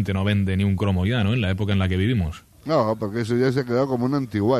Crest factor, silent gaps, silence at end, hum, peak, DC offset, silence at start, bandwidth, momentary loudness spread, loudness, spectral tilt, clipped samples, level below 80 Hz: 14 dB; none; 0 s; none; -6 dBFS; under 0.1%; 0 s; 13 kHz; 3 LU; -22 LUFS; -7.5 dB/octave; under 0.1%; -44 dBFS